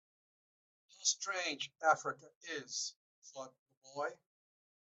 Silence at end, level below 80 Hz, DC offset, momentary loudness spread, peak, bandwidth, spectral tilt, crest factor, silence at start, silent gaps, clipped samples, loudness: 0.75 s; under -90 dBFS; under 0.1%; 18 LU; -16 dBFS; 8.2 kHz; 0 dB/octave; 26 dB; 1 s; 2.35-2.41 s, 2.96-3.22 s, 3.59-3.66 s, 3.77-3.81 s; under 0.1%; -37 LUFS